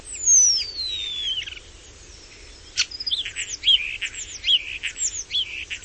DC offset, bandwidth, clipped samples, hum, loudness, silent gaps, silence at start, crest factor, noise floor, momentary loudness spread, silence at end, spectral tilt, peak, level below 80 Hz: under 0.1%; 8.8 kHz; under 0.1%; none; -21 LUFS; none; 0 s; 20 dB; -45 dBFS; 15 LU; 0 s; 3 dB/octave; -6 dBFS; -50 dBFS